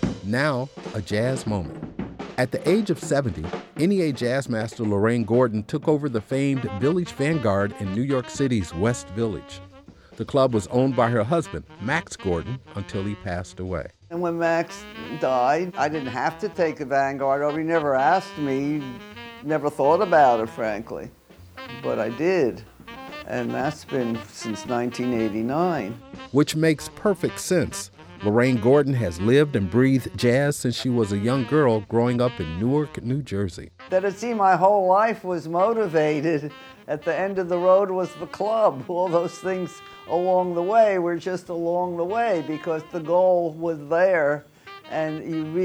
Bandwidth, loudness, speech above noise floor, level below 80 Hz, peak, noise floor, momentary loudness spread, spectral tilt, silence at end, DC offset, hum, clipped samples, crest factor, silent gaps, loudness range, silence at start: over 20 kHz; -23 LUFS; 25 dB; -52 dBFS; -6 dBFS; -48 dBFS; 13 LU; -6.5 dB/octave; 0 s; under 0.1%; none; under 0.1%; 18 dB; none; 5 LU; 0 s